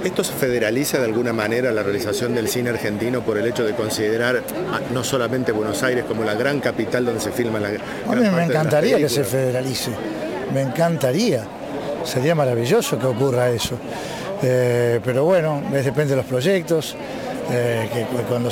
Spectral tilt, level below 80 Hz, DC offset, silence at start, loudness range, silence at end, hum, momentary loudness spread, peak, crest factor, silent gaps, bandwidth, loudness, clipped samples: -5 dB/octave; -52 dBFS; under 0.1%; 0 s; 2 LU; 0 s; none; 7 LU; -4 dBFS; 16 dB; none; 17 kHz; -21 LUFS; under 0.1%